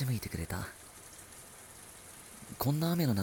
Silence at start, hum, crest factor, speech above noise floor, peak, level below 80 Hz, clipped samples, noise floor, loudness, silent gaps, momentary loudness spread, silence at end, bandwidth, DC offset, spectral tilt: 0 s; none; 18 dB; 19 dB; -18 dBFS; -56 dBFS; under 0.1%; -52 dBFS; -34 LUFS; none; 19 LU; 0 s; 18 kHz; under 0.1%; -5.5 dB/octave